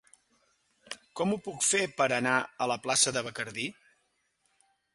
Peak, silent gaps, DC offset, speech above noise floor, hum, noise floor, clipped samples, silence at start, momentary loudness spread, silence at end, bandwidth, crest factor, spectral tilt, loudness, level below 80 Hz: -10 dBFS; none; under 0.1%; 45 dB; none; -75 dBFS; under 0.1%; 0.9 s; 13 LU; 1.2 s; 11.5 kHz; 22 dB; -2 dB/octave; -29 LUFS; -72 dBFS